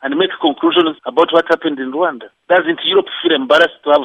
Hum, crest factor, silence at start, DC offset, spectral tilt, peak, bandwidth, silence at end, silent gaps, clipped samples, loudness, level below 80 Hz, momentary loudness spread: none; 14 dB; 0 s; under 0.1%; -4.5 dB/octave; 0 dBFS; 8.8 kHz; 0 s; none; under 0.1%; -14 LUFS; -64 dBFS; 6 LU